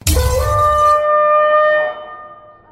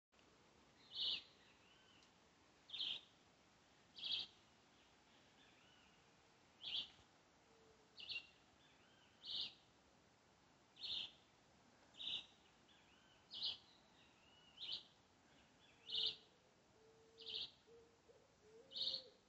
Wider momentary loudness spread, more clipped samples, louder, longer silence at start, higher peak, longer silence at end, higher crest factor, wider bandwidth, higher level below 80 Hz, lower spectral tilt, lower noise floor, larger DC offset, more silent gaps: second, 11 LU vs 25 LU; neither; first, -13 LUFS vs -47 LUFS; second, 0.05 s vs 0.2 s; first, -2 dBFS vs -30 dBFS; first, 0.35 s vs 0.1 s; second, 14 dB vs 24 dB; first, 16.5 kHz vs 8 kHz; first, -24 dBFS vs -86 dBFS; first, -4 dB/octave vs 1.5 dB/octave; second, -38 dBFS vs -73 dBFS; neither; neither